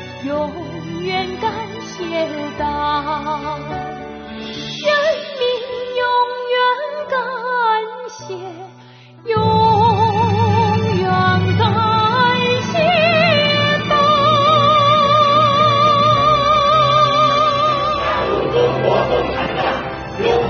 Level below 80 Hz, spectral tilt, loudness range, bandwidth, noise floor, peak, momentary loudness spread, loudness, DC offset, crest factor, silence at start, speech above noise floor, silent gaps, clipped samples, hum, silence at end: -42 dBFS; -3 dB/octave; 10 LU; 6.6 kHz; -41 dBFS; 0 dBFS; 15 LU; -15 LUFS; under 0.1%; 16 dB; 0 s; 20 dB; none; under 0.1%; none; 0 s